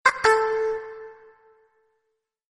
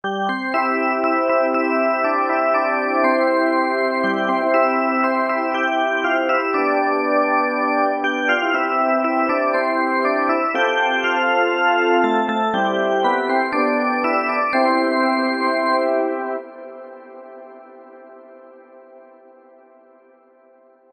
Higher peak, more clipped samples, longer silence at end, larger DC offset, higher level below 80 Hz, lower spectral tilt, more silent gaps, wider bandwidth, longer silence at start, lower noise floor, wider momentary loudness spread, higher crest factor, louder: about the same, -4 dBFS vs -6 dBFS; neither; second, 1.45 s vs 1.95 s; neither; first, -62 dBFS vs -72 dBFS; second, -1.5 dB/octave vs -5 dB/octave; neither; about the same, 11.5 kHz vs 10.5 kHz; about the same, 0.05 s vs 0.05 s; first, -78 dBFS vs -52 dBFS; first, 23 LU vs 3 LU; first, 22 dB vs 14 dB; second, -22 LUFS vs -18 LUFS